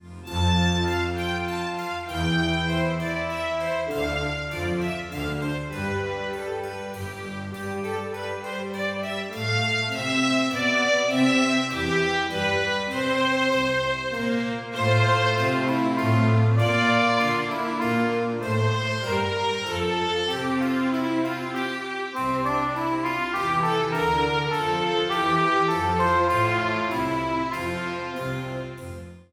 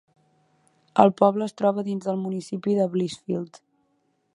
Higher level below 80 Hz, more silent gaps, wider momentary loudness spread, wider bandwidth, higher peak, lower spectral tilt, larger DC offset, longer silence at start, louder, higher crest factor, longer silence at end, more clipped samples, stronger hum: first, -48 dBFS vs -72 dBFS; neither; about the same, 10 LU vs 12 LU; first, 17 kHz vs 11 kHz; second, -8 dBFS vs 0 dBFS; second, -5.5 dB/octave vs -7.5 dB/octave; neither; second, 0.05 s vs 0.95 s; about the same, -24 LUFS vs -24 LUFS; second, 16 dB vs 24 dB; second, 0.1 s vs 0.9 s; neither; neither